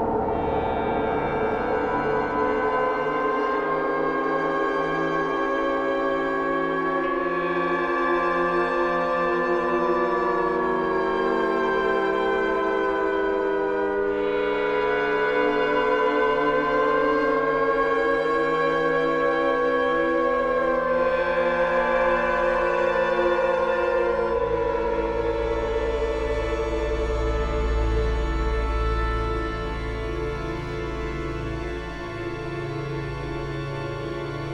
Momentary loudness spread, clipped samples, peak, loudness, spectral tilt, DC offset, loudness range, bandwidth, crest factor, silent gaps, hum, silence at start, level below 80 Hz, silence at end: 8 LU; under 0.1%; -10 dBFS; -24 LUFS; -7 dB/octave; under 0.1%; 6 LU; 9.6 kHz; 14 dB; none; none; 0 s; -36 dBFS; 0 s